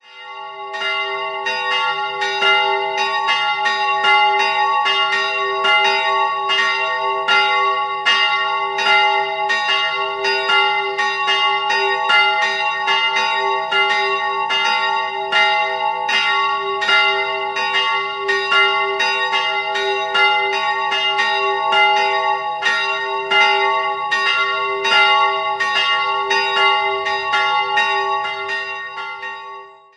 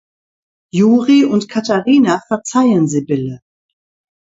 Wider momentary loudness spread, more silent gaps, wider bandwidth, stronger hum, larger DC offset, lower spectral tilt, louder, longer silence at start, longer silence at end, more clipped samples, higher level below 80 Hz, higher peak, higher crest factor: about the same, 7 LU vs 9 LU; neither; first, 11 kHz vs 8 kHz; neither; neither; second, -0.5 dB/octave vs -6 dB/octave; about the same, -16 LUFS vs -14 LUFS; second, 0.1 s vs 0.75 s; second, 0.25 s vs 0.95 s; neither; about the same, -64 dBFS vs -60 dBFS; about the same, 0 dBFS vs 0 dBFS; about the same, 16 dB vs 14 dB